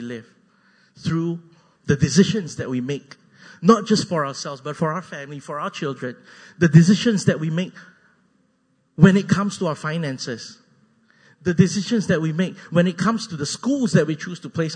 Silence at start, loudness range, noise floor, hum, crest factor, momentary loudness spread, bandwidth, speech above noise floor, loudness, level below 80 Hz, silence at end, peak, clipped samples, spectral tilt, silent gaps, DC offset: 0 s; 4 LU; -65 dBFS; none; 20 dB; 16 LU; 9.6 kHz; 45 dB; -21 LUFS; -56 dBFS; 0 s; 0 dBFS; under 0.1%; -6 dB/octave; none; under 0.1%